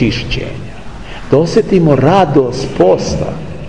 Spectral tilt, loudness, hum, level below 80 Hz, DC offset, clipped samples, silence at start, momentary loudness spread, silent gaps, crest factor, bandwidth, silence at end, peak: -6.5 dB/octave; -12 LUFS; none; -30 dBFS; 3%; under 0.1%; 0 s; 20 LU; none; 12 dB; 10.5 kHz; 0 s; 0 dBFS